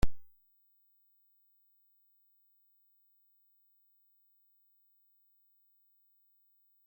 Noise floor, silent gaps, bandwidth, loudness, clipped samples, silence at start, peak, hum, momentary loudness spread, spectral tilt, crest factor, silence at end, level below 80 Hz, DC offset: -71 dBFS; none; 16.5 kHz; -59 LUFS; under 0.1%; 0.05 s; -14 dBFS; 50 Hz at -120 dBFS; 0 LU; -6 dB/octave; 24 dB; 6.65 s; -50 dBFS; under 0.1%